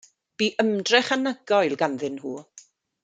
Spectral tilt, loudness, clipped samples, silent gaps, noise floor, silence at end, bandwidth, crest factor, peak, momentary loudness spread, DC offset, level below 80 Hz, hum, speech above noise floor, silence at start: -3.5 dB/octave; -23 LUFS; under 0.1%; none; -53 dBFS; 0.45 s; 9.4 kHz; 22 dB; -4 dBFS; 14 LU; under 0.1%; -76 dBFS; none; 29 dB; 0.4 s